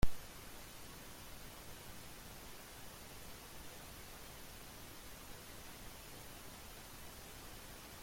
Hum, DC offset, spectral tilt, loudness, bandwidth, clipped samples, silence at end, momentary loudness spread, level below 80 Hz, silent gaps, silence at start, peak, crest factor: none; under 0.1%; -3.5 dB/octave; -52 LUFS; 16.5 kHz; under 0.1%; 0 s; 0 LU; -54 dBFS; none; 0 s; -18 dBFS; 26 dB